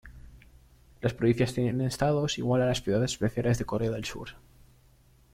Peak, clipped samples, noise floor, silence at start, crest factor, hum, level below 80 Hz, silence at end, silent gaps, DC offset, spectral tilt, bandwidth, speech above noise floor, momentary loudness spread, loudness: -12 dBFS; under 0.1%; -60 dBFS; 0.05 s; 18 dB; none; -50 dBFS; 0.95 s; none; under 0.1%; -6 dB/octave; 15.5 kHz; 32 dB; 8 LU; -28 LUFS